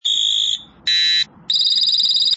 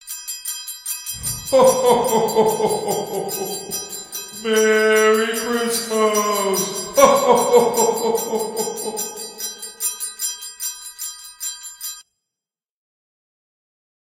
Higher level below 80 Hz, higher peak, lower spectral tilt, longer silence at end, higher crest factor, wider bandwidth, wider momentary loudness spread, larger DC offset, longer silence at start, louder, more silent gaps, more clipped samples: second, -64 dBFS vs -56 dBFS; second, -6 dBFS vs 0 dBFS; second, 2.5 dB/octave vs -2.5 dB/octave; second, 0 s vs 2.1 s; second, 10 dB vs 20 dB; second, 8 kHz vs 17 kHz; second, 5 LU vs 14 LU; neither; about the same, 0.05 s vs 0.05 s; first, -15 LUFS vs -19 LUFS; neither; neither